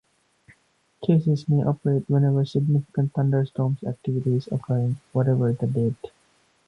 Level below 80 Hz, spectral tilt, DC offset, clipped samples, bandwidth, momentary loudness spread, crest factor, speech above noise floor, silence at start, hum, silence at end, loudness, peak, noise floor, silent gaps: -60 dBFS; -10 dB/octave; under 0.1%; under 0.1%; 6.2 kHz; 6 LU; 18 dB; 42 dB; 1 s; none; 0.6 s; -24 LUFS; -6 dBFS; -64 dBFS; none